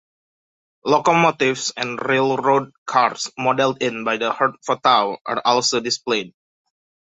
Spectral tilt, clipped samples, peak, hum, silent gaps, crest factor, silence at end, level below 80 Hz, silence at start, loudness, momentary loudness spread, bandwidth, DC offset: -3.5 dB/octave; under 0.1%; -2 dBFS; none; 2.78-2.86 s, 5.21-5.25 s; 18 dB; 0.75 s; -66 dBFS; 0.85 s; -19 LUFS; 7 LU; 8.4 kHz; under 0.1%